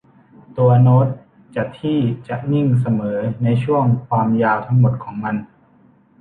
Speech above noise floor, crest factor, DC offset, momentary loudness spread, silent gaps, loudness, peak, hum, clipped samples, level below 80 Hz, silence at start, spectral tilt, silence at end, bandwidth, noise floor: 36 dB; 16 dB; under 0.1%; 12 LU; none; -18 LUFS; -2 dBFS; none; under 0.1%; -54 dBFS; 0.5 s; -10.5 dB/octave; 0.75 s; 3.9 kHz; -52 dBFS